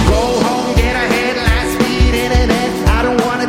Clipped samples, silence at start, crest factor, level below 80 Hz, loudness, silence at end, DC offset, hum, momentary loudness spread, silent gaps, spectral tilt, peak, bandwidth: under 0.1%; 0 s; 14 dB; -18 dBFS; -14 LUFS; 0 s; under 0.1%; none; 2 LU; none; -5 dB/octave; 0 dBFS; 16 kHz